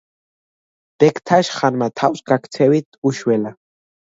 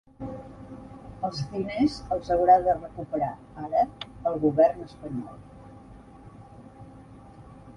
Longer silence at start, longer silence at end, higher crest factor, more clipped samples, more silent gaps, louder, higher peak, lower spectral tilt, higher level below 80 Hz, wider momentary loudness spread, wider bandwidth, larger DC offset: first, 1 s vs 0.2 s; first, 0.55 s vs 0.05 s; about the same, 18 dB vs 20 dB; neither; first, 2.85-2.92 s, 2.98-3.02 s vs none; first, -17 LUFS vs -26 LUFS; first, 0 dBFS vs -8 dBFS; about the same, -6 dB/octave vs -7 dB/octave; second, -64 dBFS vs -52 dBFS; second, 5 LU vs 27 LU; second, 8 kHz vs 10.5 kHz; neither